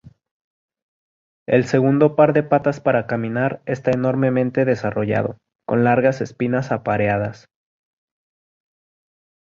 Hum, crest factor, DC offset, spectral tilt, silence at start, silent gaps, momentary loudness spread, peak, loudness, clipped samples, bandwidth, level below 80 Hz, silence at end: none; 18 dB; under 0.1%; -8 dB/octave; 1.5 s; none; 8 LU; -2 dBFS; -19 LUFS; under 0.1%; 7.6 kHz; -54 dBFS; 2.1 s